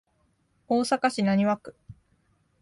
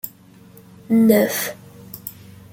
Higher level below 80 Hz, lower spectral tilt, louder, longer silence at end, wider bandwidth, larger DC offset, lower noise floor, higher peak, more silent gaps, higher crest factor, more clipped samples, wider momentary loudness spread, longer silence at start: about the same, -64 dBFS vs -60 dBFS; about the same, -5.5 dB/octave vs -5 dB/octave; second, -25 LUFS vs -18 LUFS; first, 0.7 s vs 0.45 s; second, 11.5 kHz vs 17 kHz; neither; first, -69 dBFS vs -46 dBFS; second, -10 dBFS vs -2 dBFS; neither; about the same, 18 dB vs 18 dB; neither; second, 8 LU vs 22 LU; first, 0.7 s vs 0.05 s